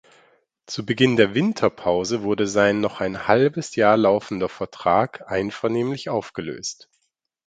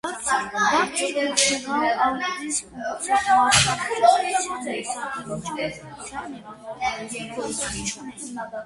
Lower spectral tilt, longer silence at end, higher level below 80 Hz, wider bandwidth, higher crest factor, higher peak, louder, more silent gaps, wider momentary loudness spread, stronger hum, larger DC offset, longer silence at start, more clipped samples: first, -5 dB/octave vs -2 dB/octave; first, 0.75 s vs 0 s; about the same, -56 dBFS vs -52 dBFS; second, 9.2 kHz vs 11.5 kHz; about the same, 22 dB vs 22 dB; about the same, 0 dBFS vs -2 dBFS; about the same, -21 LUFS vs -23 LUFS; neither; second, 12 LU vs 16 LU; neither; neither; first, 0.7 s vs 0.05 s; neither